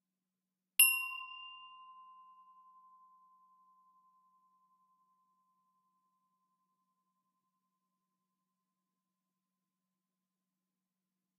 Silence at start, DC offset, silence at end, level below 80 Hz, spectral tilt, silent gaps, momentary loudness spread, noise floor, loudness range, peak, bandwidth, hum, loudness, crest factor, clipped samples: 0.8 s; under 0.1%; 9.7 s; under -90 dBFS; 7.5 dB/octave; none; 26 LU; under -90 dBFS; 22 LU; -10 dBFS; 5.4 kHz; none; -29 LUFS; 34 dB; under 0.1%